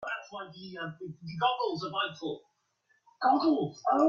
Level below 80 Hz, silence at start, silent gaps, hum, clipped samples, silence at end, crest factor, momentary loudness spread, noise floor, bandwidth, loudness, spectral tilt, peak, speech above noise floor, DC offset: -76 dBFS; 0 s; none; none; under 0.1%; 0 s; 18 dB; 17 LU; -73 dBFS; 7.2 kHz; -31 LUFS; -6 dB/octave; -14 dBFS; 43 dB; under 0.1%